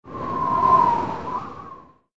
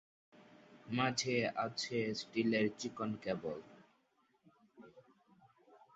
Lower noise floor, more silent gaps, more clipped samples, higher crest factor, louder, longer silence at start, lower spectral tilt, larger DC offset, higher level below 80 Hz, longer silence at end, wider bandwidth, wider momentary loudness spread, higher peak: second, -44 dBFS vs -76 dBFS; neither; neither; about the same, 18 dB vs 22 dB; first, -21 LUFS vs -37 LUFS; second, 0.05 s vs 0.4 s; first, -7 dB/octave vs -3.5 dB/octave; neither; first, -50 dBFS vs -76 dBFS; about the same, 0.3 s vs 0.2 s; about the same, 7.6 kHz vs 8 kHz; first, 21 LU vs 8 LU; first, -6 dBFS vs -18 dBFS